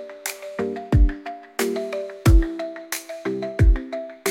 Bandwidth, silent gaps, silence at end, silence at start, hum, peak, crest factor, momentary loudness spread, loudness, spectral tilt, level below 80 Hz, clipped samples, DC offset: 17 kHz; none; 0 s; 0 s; none; -6 dBFS; 16 dB; 12 LU; -24 LUFS; -6 dB/octave; -24 dBFS; under 0.1%; under 0.1%